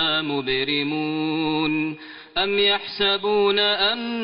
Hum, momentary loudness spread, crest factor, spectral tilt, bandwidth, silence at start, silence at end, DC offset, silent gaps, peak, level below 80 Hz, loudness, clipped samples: none; 6 LU; 14 dB; -1.5 dB/octave; 5.4 kHz; 0 s; 0 s; under 0.1%; none; -8 dBFS; -54 dBFS; -21 LUFS; under 0.1%